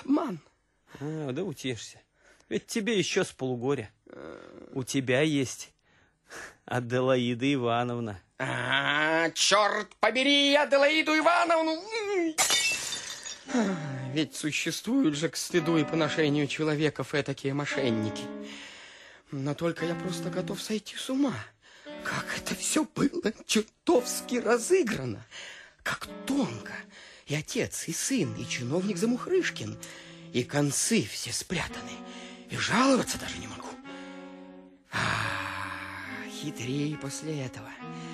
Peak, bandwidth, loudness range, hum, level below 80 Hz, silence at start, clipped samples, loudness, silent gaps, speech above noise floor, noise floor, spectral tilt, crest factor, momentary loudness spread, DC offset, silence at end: -8 dBFS; 13 kHz; 9 LU; none; -62 dBFS; 0 s; under 0.1%; -28 LUFS; none; 37 dB; -66 dBFS; -3.5 dB/octave; 22 dB; 19 LU; under 0.1%; 0 s